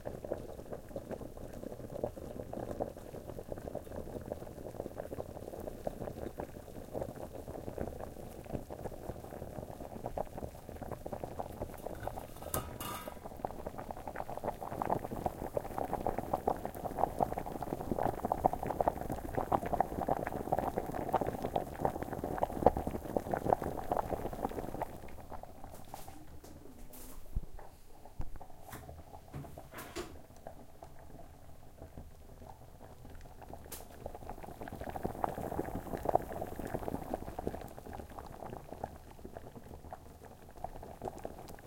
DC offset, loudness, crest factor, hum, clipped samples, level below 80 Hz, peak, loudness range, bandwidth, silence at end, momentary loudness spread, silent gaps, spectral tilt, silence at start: under 0.1%; -40 LUFS; 32 dB; none; under 0.1%; -52 dBFS; -8 dBFS; 15 LU; 17 kHz; 0 s; 18 LU; none; -6.5 dB/octave; 0 s